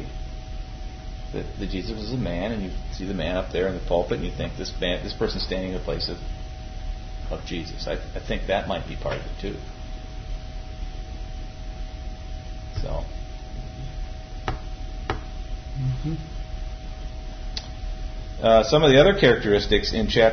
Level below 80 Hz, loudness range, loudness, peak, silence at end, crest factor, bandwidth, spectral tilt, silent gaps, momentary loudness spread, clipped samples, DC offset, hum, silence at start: -32 dBFS; 15 LU; -25 LUFS; -4 dBFS; 0 s; 22 dB; 6.6 kHz; -5.5 dB/octave; none; 19 LU; under 0.1%; under 0.1%; none; 0 s